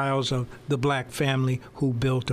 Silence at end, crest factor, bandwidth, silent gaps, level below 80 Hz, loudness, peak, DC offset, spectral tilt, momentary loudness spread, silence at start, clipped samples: 0 s; 14 dB; 14.5 kHz; none; -50 dBFS; -26 LUFS; -12 dBFS; under 0.1%; -6 dB/octave; 4 LU; 0 s; under 0.1%